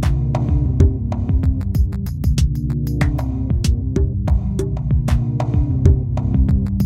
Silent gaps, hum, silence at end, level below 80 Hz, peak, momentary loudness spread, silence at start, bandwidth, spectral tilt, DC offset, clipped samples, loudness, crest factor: none; none; 0 s; -20 dBFS; 0 dBFS; 5 LU; 0 s; 12.5 kHz; -8 dB/octave; under 0.1%; under 0.1%; -19 LUFS; 16 dB